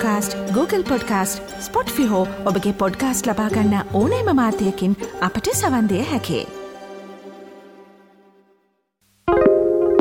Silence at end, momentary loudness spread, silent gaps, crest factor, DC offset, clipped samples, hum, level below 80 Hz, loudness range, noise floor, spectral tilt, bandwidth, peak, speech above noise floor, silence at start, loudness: 0 s; 18 LU; none; 18 dB; under 0.1%; under 0.1%; none; -46 dBFS; 7 LU; -65 dBFS; -5 dB/octave; 17.5 kHz; -2 dBFS; 46 dB; 0 s; -20 LUFS